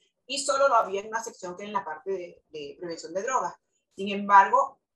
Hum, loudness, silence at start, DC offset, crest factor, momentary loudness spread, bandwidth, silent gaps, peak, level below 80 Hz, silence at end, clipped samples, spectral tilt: none; -26 LUFS; 0.3 s; under 0.1%; 24 dB; 19 LU; 12 kHz; none; -4 dBFS; -76 dBFS; 0.25 s; under 0.1%; -2.5 dB/octave